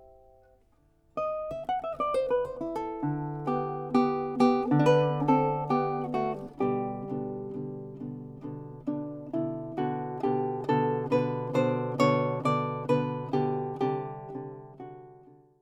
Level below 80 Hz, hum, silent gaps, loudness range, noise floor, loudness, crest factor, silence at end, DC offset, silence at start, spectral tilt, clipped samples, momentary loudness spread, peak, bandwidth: -62 dBFS; none; none; 8 LU; -65 dBFS; -29 LUFS; 20 dB; 0.25 s; under 0.1%; 0 s; -8 dB/octave; under 0.1%; 15 LU; -10 dBFS; 11 kHz